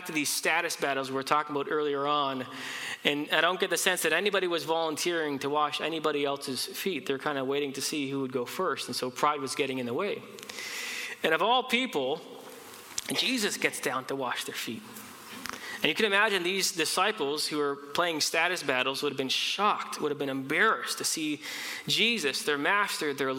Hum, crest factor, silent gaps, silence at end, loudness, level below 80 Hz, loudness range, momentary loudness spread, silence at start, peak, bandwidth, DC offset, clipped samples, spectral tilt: none; 22 dB; none; 0 s; -28 LUFS; -78 dBFS; 4 LU; 10 LU; 0 s; -8 dBFS; 17 kHz; under 0.1%; under 0.1%; -2 dB/octave